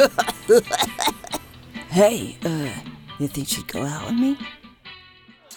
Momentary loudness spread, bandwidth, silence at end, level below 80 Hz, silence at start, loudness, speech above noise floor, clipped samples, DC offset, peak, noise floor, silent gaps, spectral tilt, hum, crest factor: 21 LU; 19.5 kHz; 0 s; -52 dBFS; 0 s; -22 LUFS; 29 dB; under 0.1%; under 0.1%; -4 dBFS; -50 dBFS; none; -4 dB/octave; none; 20 dB